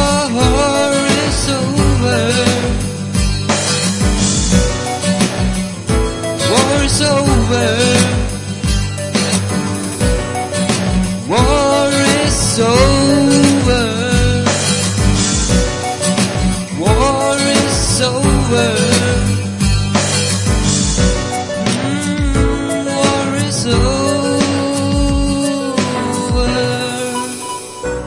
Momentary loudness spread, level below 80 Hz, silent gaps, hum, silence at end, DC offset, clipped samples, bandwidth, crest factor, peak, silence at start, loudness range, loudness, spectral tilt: 6 LU; -24 dBFS; none; none; 0 s; under 0.1%; under 0.1%; 11.5 kHz; 14 dB; 0 dBFS; 0 s; 3 LU; -14 LUFS; -4.5 dB/octave